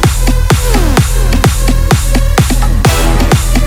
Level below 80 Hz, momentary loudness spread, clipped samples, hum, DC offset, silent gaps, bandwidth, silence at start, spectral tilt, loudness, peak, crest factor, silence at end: -10 dBFS; 2 LU; 0.5%; none; under 0.1%; none; 18.5 kHz; 0 s; -5 dB/octave; -11 LUFS; 0 dBFS; 8 dB; 0 s